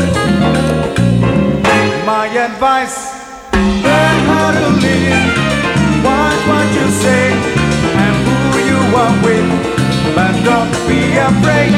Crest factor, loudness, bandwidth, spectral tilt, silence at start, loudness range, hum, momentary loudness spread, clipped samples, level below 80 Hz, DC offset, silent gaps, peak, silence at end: 10 dB; -12 LUFS; 15.5 kHz; -5.5 dB/octave; 0 s; 1 LU; none; 3 LU; under 0.1%; -30 dBFS; under 0.1%; none; 0 dBFS; 0 s